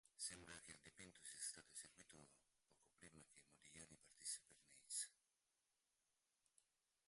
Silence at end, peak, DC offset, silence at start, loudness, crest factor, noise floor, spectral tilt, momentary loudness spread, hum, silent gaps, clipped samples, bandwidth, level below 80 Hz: 1.95 s; -38 dBFS; under 0.1%; 0.05 s; -55 LUFS; 24 dB; -90 dBFS; -0.5 dB/octave; 18 LU; none; none; under 0.1%; 11.5 kHz; -86 dBFS